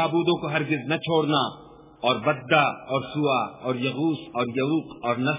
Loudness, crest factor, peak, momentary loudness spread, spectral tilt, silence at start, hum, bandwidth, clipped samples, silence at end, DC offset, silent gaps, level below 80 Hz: -25 LUFS; 20 dB; -6 dBFS; 7 LU; -10 dB/octave; 0 s; none; 3.9 kHz; under 0.1%; 0 s; under 0.1%; none; -64 dBFS